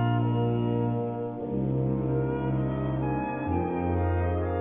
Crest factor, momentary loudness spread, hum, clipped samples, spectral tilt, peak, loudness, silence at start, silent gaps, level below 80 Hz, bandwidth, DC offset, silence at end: 12 dB; 4 LU; none; under 0.1%; -12.5 dB/octave; -14 dBFS; -28 LUFS; 0 s; none; -42 dBFS; 3.6 kHz; under 0.1%; 0 s